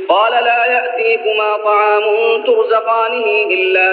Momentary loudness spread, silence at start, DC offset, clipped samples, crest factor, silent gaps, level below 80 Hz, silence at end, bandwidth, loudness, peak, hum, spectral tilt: 3 LU; 0 s; under 0.1%; under 0.1%; 12 dB; none; -80 dBFS; 0 s; 4.9 kHz; -13 LUFS; 0 dBFS; none; 3.5 dB/octave